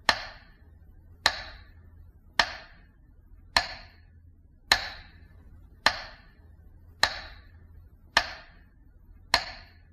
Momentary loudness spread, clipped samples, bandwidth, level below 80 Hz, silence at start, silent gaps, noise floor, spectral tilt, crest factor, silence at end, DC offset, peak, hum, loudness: 20 LU; under 0.1%; 14 kHz; -52 dBFS; 0.1 s; none; -55 dBFS; -1 dB/octave; 28 dB; 0.3 s; under 0.1%; -6 dBFS; none; -28 LUFS